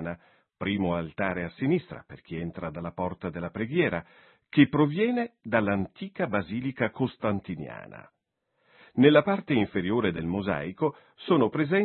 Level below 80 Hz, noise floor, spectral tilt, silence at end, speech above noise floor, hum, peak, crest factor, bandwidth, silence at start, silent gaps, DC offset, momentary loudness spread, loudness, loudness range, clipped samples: -60 dBFS; -77 dBFS; -11 dB/octave; 0 s; 50 dB; none; -6 dBFS; 22 dB; 4.3 kHz; 0 s; none; under 0.1%; 15 LU; -27 LUFS; 5 LU; under 0.1%